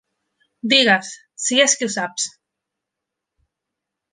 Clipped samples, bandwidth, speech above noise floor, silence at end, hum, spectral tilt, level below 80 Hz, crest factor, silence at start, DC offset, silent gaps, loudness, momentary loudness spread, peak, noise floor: under 0.1%; 10.5 kHz; 65 dB; 1.85 s; none; -1 dB/octave; -72 dBFS; 22 dB; 0.65 s; under 0.1%; none; -17 LUFS; 14 LU; -2 dBFS; -83 dBFS